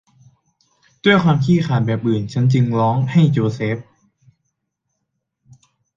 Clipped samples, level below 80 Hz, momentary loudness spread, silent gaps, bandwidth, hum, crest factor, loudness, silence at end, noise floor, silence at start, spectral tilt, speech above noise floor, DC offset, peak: under 0.1%; -54 dBFS; 6 LU; none; 7.4 kHz; none; 18 dB; -17 LUFS; 2.15 s; -75 dBFS; 1.05 s; -8 dB/octave; 59 dB; under 0.1%; -2 dBFS